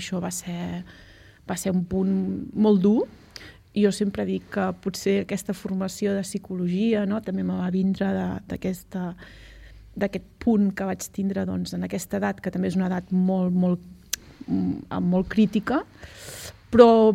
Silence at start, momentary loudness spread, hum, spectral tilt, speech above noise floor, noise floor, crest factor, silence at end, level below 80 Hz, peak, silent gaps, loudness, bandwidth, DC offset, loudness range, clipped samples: 0 s; 11 LU; none; -6.5 dB/octave; 22 dB; -46 dBFS; 24 dB; 0 s; -52 dBFS; 0 dBFS; none; -25 LUFS; 15.5 kHz; under 0.1%; 4 LU; under 0.1%